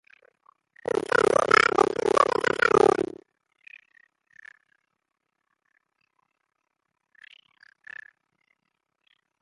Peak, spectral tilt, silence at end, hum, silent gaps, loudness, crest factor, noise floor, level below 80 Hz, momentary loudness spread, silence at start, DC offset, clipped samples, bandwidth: -4 dBFS; -3.5 dB/octave; 6.4 s; none; none; -22 LUFS; 24 dB; -81 dBFS; -64 dBFS; 25 LU; 0.95 s; under 0.1%; under 0.1%; 11.5 kHz